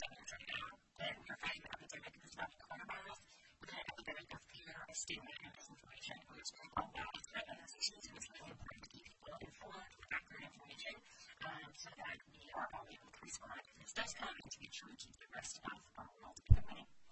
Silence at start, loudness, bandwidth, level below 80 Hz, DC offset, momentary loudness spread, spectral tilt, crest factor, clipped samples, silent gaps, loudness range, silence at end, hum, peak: 0 s; -48 LUFS; 8.4 kHz; -52 dBFS; under 0.1%; 12 LU; -3.5 dB/octave; 34 dB; under 0.1%; none; 4 LU; 0 s; none; -12 dBFS